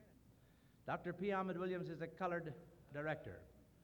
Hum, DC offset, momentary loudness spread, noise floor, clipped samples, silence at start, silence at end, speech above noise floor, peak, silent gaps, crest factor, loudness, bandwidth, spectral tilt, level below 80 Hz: none; under 0.1%; 15 LU; -69 dBFS; under 0.1%; 0 s; 0.2 s; 25 dB; -28 dBFS; none; 18 dB; -45 LUFS; 19.5 kHz; -8 dB/octave; -72 dBFS